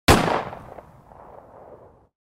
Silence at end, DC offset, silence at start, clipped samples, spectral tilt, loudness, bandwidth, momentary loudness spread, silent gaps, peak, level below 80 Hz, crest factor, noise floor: 0.55 s; under 0.1%; 0.1 s; under 0.1%; -4.5 dB/octave; -21 LUFS; 16 kHz; 28 LU; none; -2 dBFS; -36 dBFS; 24 dB; -48 dBFS